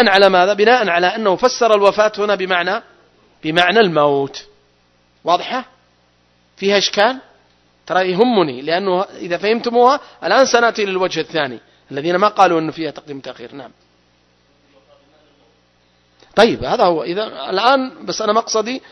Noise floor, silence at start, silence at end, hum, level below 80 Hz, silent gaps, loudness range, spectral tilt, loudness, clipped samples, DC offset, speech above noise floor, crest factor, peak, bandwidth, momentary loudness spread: -57 dBFS; 0 s; 0.15 s; 60 Hz at -50 dBFS; -54 dBFS; none; 5 LU; -4 dB/octave; -15 LUFS; under 0.1%; under 0.1%; 41 dB; 16 dB; 0 dBFS; 11 kHz; 14 LU